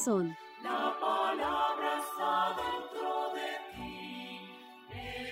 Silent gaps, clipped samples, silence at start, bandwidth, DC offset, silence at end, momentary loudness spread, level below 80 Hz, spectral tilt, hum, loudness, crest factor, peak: none; under 0.1%; 0 s; 16 kHz; under 0.1%; 0 s; 13 LU; -64 dBFS; -3.5 dB/octave; none; -34 LUFS; 16 dB; -18 dBFS